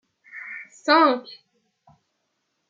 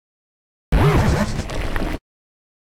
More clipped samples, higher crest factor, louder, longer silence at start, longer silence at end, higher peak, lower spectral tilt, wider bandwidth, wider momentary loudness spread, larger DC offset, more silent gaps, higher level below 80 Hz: neither; first, 22 dB vs 16 dB; about the same, -20 LUFS vs -21 LUFS; second, 0.35 s vs 0.7 s; first, 1.4 s vs 0.8 s; about the same, -4 dBFS vs -6 dBFS; second, -3 dB/octave vs -6.5 dB/octave; second, 7.6 kHz vs 16 kHz; first, 24 LU vs 12 LU; neither; neither; second, -84 dBFS vs -26 dBFS